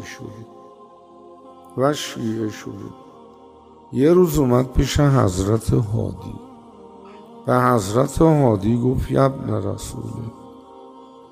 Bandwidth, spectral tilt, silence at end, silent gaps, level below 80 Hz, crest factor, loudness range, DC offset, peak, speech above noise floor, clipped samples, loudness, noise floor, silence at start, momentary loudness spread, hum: 16 kHz; -7 dB/octave; 0.25 s; none; -36 dBFS; 18 dB; 9 LU; under 0.1%; -4 dBFS; 27 dB; under 0.1%; -19 LUFS; -46 dBFS; 0 s; 19 LU; none